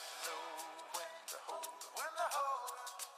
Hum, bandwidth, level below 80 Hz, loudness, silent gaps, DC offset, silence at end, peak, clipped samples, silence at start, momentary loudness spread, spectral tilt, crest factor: none; 15.5 kHz; under -90 dBFS; -43 LUFS; none; under 0.1%; 0 s; -28 dBFS; under 0.1%; 0 s; 8 LU; 2 dB/octave; 16 dB